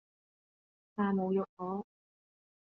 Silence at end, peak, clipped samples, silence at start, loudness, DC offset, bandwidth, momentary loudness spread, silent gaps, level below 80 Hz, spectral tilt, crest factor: 0.85 s; -22 dBFS; under 0.1%; 0.95 s; -35 LUFS; under 0.1%; 3.4 kHz; 13 LU; 1.49-1.57 s; -80 dBFS; -8 dB/octave; 16 dB